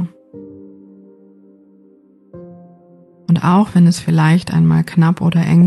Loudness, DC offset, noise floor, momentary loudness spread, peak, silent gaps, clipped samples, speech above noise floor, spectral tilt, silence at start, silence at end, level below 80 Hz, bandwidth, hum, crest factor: -13 LUFS; under 0.1%; -49 dBFS; 16 LU; -2 dBFS; none; under 0.1%; 37 dB; -7.5 dB/octave; 0 s; 0 s; -50 dBFS; 11.5 kHz; none; 12 dB